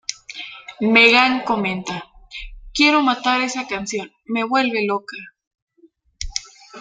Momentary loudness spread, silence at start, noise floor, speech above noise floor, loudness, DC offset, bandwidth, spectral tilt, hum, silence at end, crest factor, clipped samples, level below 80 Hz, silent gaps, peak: 22 LU; 0.1 s; -56 dBFS; 38 dB; -18 LUFS; under 0.1%; 9.4 kHz; -3 dB/octave; none; 0 s; 20 dB; under 0.1%; -44 dBFS; 5.47-5.51 s, 5.62-5.67 s; 0 dBFS